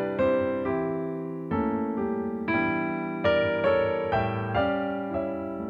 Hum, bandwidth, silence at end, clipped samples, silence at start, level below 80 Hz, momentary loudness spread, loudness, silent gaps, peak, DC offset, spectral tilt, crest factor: none; 5.4 kHz; 0 s; under 0.1%; 0 s; -52 dBFS; 7 LU; -27 LUFS; none; -12 dBFS; under 0.1%; -8.5 dB/octave; 14 dB